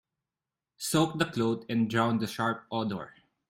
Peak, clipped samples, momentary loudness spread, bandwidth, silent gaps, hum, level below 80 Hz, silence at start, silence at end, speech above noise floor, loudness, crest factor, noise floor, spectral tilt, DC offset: -10 dBFS; under 0.1%; 9 LU; 16 kHz; none; none; -66 dBFS; 0.8 s; 0.4 s; over 61 dB; -30 LUFS; 20 dB; under -90 dBFS; -5 dB/octave; under 0.1%